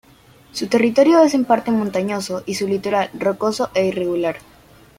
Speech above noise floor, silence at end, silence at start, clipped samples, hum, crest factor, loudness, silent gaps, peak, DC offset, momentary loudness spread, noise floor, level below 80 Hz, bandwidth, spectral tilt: 31 dB; 0.6 s; 0.55 s; under 0.1%; none; 16 dB; -18 LUFS; none; -2 dBFS; under 0.1%; 11 LU; -49 dBFS; -56 dBFS; 16 kHz; -5 dB/octave